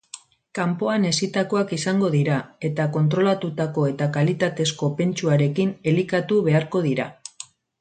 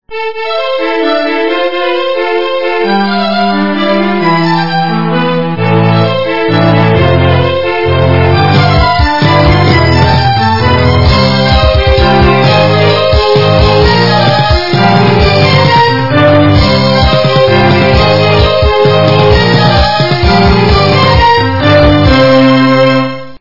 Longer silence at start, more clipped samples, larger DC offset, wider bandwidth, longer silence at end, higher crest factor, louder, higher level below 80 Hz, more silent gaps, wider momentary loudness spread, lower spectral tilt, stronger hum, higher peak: first, 0.15 s vs 0 s; second, under 0.1% vs 2%; second, under 0.1% vs 5%; first, 9.2 kHz vs 6 kHz; first, 0.35 s vs 0 s; first, 14 dB vs 8 dB; second, -22 LUFS vs -8 LUFS; second, -64 dBFS vs -20 dBFS; neither; first, 11 LU vs 5 LU; about the same, -6 dB/octave vs -7 dB/octave; neither; second, -8 dBFS vs 0 dBFS